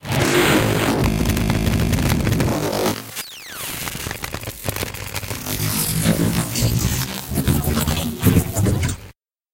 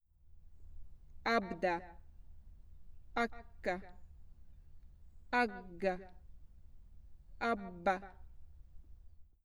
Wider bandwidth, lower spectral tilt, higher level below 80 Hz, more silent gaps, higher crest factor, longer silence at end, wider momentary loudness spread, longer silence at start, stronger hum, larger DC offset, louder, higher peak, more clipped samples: second, 17 kHz vs over 20 kHz; about the same, -4.5 dB/octave vs -5.5 dB/octave; first, -30 dBFS vs -58 dBFS; neither; second, 18 dB vs 24 dB; first, 0.45 s vs 0.15 s; second, 10 LU vs 25 LU; second, 0.05 s vs 0.2 s; neither; neither; first, -20 LUFS vs -38 LUFS; first, -2 dBFS vs -18 dBFS; neither